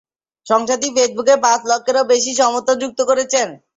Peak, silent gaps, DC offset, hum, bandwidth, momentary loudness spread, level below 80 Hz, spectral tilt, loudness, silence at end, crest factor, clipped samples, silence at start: -2 dBFS; none; under 0.1%; none; 8 kHz; 4 LU; -64 dBFS; -1 dB/octave; -16 LUFS; 0.2 s; 16 dB; under 0.1%; 0.45 s